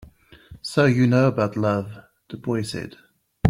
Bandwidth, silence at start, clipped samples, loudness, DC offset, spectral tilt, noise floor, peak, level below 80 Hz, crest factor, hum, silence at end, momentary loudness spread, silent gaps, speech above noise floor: 13.5 kHz; 0.5 s; under 0.1%; -22 LUFS; under 0.1%; -7 dB/octave; -47 dBFS; -4 dBFS; -56 dBFS; 20 dB; none; 0 s; 19 LU; none; 26 dB